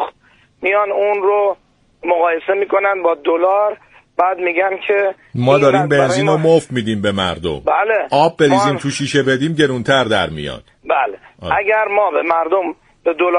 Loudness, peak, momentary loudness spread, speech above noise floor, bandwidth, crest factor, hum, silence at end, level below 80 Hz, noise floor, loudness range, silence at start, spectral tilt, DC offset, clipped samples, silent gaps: -15 LUFS; 0 dBFS; 9 LU; 38 dB; 10.5 kHz; 16 dB; none; 0 s; -48 dBFS; -53 dBFS; 2 LU; 0 s; -5.5 dB/octave; under 0.1%; under 0.1%; none